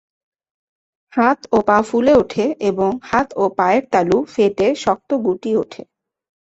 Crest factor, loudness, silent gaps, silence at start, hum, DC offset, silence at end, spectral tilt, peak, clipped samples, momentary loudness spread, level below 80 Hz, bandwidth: 16 dB; -17 LUFS; none; 1.15 s; none; under 0.1%; 0.8 s; -6 dB/octave; -2 dBFS; under 0.1%; 6 LU; -50 dBFS; 8.2 kHz